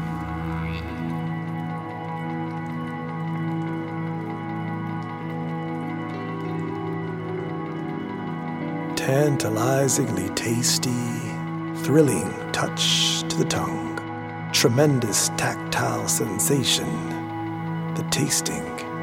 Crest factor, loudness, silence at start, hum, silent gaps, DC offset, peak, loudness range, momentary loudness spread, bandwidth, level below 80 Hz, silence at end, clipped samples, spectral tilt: 20 dB; -25 LUFS; 0 s; none; none; under 0.1%; -4 dBFS; 8 LU; 11 LU; 16.5 kHz; -50 dBFS; 0 s; under 0.1%; -4 dB/octave